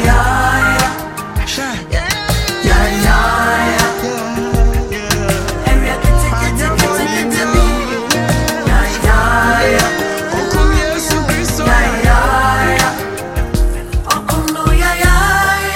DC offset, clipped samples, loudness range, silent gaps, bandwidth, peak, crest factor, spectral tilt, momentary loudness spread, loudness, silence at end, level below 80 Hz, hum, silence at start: under 0.1%; under 0.1%; 1 LU; none; 17 kHz; 0 dBFS; 12 dB; -4 dB/octave; 7 LU; -13 LUFS; 0 s; -16 dBFS; none; 0 s